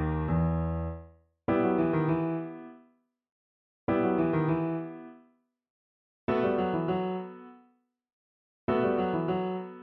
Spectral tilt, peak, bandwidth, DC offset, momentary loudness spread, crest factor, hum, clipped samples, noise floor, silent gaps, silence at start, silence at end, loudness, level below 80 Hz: -11 dB/octave; -14 dBFS; 4.8 kHz; under 0.1%; 16 LU; 16 dB; none; under 0.1%; -68 dBFS; 3.32-3.87 s, 5.70-6.27 s, 8.13-8.68 s; 0 s; 0 s; -30 LUFS; -46 dBFS